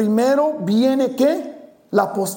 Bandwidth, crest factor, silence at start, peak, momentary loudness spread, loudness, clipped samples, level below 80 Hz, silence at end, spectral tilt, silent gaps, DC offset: 17 kHz; 16 dB; 0 s; -2 dBFS; 6 LU; -18 LUFS; under 0.1%; -66 dBFS; 0 s; -5.5 dB/octave; none; under 0.1%